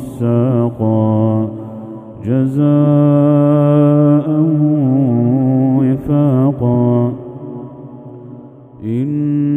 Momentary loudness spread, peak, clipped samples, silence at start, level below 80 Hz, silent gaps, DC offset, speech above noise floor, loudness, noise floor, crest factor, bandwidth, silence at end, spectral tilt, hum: 18 LU; 0 dBFS; under 0.1%; 0 s; -48 dBFS; none; under 0.1%; 24 dB; -13 LUFS; -35 dBFS; 14 dB; 3.6 kHz; 0 s; -11.5 dB/octave; none